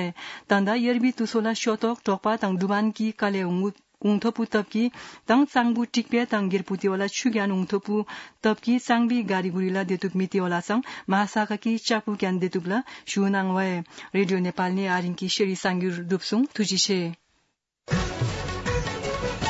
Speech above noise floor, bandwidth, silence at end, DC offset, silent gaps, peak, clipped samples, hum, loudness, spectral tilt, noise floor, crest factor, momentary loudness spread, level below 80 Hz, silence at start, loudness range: 48 dB; 8 kHz; 0 s; under 0.1%; none; -6 dBFS; under 0.1%; none; -25 LUFS; -5 dB/octave; -73 dBFS; 18 dB; 6 LU; -48 dBFS; 0 s; 2 LU